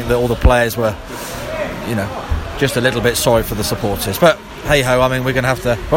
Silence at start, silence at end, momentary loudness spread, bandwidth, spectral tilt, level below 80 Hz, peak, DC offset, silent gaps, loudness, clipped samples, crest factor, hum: 0 s; 0 s; 10 LU; 17 kHz; -4.5 dB/octave; -26 dBFS; 0 dBFS; under 0.1%; none; -16 LUFS; under 0.1%; 16 dB; none